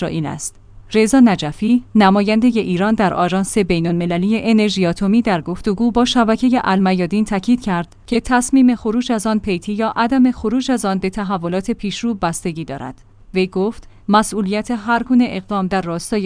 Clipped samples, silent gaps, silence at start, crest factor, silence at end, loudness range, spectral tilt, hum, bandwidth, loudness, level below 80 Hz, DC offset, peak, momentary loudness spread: under 0.1%; none; 0 s; 16 dB; 0 s; 5 LU; -5.5 dB/octave; none; 10.5 kHz; -17 LUFS; -40 dBFS; under 0.1%; 0 dBFS; 9 LU